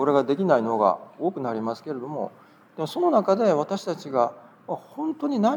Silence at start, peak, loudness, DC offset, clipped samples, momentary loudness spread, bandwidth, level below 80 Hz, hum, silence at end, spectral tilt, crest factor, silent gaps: 0 s; -6 dBFS; -25 LUFS; under 0.1%; under 0.1%; 13 LU; 19.5 kHz; -84 dBFS; none; 0 s; -7 dB/octave; 18 dB; none